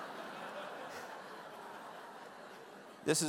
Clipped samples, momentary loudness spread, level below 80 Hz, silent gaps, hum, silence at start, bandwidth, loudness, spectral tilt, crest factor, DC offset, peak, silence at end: under 0.1%; 9 LU; -84 dBFS; none; none; 0 s; 16 kHz; -46 LUFS; -3 dB/octave; 24 dB; under 0.1%; -18 dBFS; 0 s